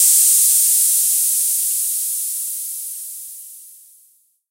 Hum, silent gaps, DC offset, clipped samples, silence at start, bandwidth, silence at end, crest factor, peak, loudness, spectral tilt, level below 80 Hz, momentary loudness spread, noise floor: none; none; under 0.1%; under 0.1%; 0 s; 16 kHz; 0.75 s; 18 dB; 0 dBFS; -14 LUFS; 10 dB/octave; under -90 dBFS; 19 LU; -56 dBFS